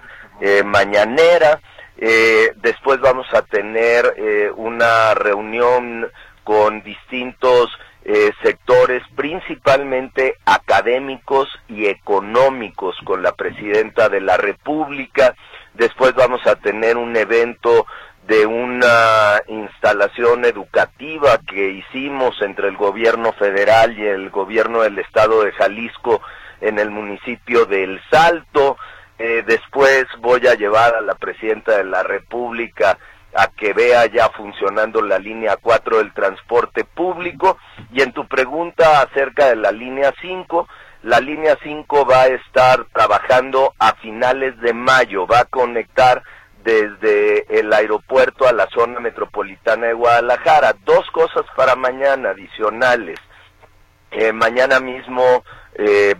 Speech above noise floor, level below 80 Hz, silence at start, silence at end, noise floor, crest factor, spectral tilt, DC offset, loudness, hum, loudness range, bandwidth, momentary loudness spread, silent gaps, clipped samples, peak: 34 dB; -48 dBFS; 0.05 s; 0.05 s; -49 dBFS; 16 dB; -4.5 dB/octave; under 0.1%; -15 LUFS; none; 3 LU; 13 kHz; 10 LU; none; under 0.1%; 0 dBFS